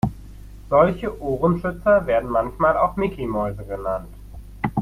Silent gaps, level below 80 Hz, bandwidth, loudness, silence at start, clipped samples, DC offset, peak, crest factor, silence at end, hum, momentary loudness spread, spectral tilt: none; -38 dBFS; 15 kHz; -21 LUFS; 0.05 s; under 0.1%; under 0.1%; -4 dBFS; 18 dB; 0 s; none; 11 LU; -8.5 dB/octave